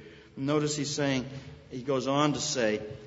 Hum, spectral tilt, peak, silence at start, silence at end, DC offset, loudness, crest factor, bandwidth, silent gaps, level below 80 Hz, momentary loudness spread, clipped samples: none; -4.5 dB/octave; -10 dBFS; 0 s; 0 s; under 0.1%; -29 LUFS; 20 dB; 8 kHz; none; -60 dBFS; 15 LU; under 0.1%